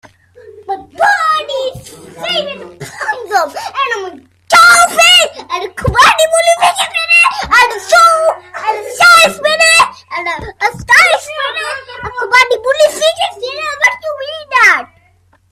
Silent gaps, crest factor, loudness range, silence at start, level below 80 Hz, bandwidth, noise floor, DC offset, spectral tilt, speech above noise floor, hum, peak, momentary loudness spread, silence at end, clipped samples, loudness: none; 12 dB; 8 LU; 0.45 s; -40 dBFS; 16.5 kHz; -51 dBFS; under 0.1%; -1 dB/octave; 38 dB; none; 0 dBFS; 16 LU; 0.65 s; 0.1%; -9 LUFS